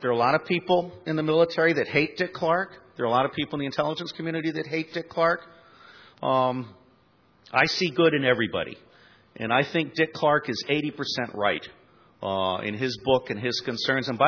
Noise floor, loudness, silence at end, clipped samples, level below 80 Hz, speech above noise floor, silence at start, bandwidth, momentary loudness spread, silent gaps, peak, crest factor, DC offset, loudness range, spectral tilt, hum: -61 dBFS; -25 LUFS; 0 s; under 0.1%; -64 dBFS; 36 dB; 0 s; 5.4 kHz; 9 LU; none; -6 dBFS; 20 dB; under 0.1%; 4 LU; -5.5 dB/octave; none